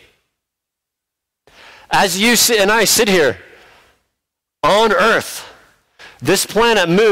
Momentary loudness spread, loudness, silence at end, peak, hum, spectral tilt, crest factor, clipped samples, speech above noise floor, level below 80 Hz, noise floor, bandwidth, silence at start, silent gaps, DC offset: 10 LU; -13 LUFS; 0 s; -4 dBFS; none; -2.5 dB/octave; 12 dB; under 0.1%; 68 dB; -46 dBFS; -81 dBFS; 16.5 kHz; 1.9 s; none; under 0.1%